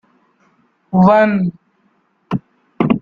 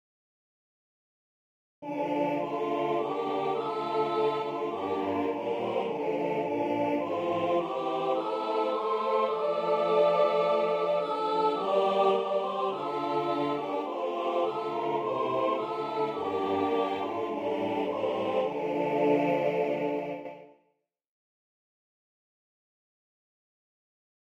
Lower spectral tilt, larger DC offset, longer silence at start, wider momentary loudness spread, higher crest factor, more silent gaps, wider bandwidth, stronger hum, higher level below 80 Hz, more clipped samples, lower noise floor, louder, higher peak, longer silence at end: first, -9.5 dB/octave vs -6.5 dB/octave; neither; second, 0.9 s vs 1.8 s; first, 14 LU vs 6 LU; about the same, 16 dB vs 16 dB; neither; second, 5 kHz vs 9 kHz; neither; first, -52 dBFS vs -76 dBFS; neither; second, -60 dBFS vs -76 dBFS; first, -15 LUFS vs -29 LUFS; first, -2 dBFS vs -14 dBFS; second, 0 s vs 3.75 s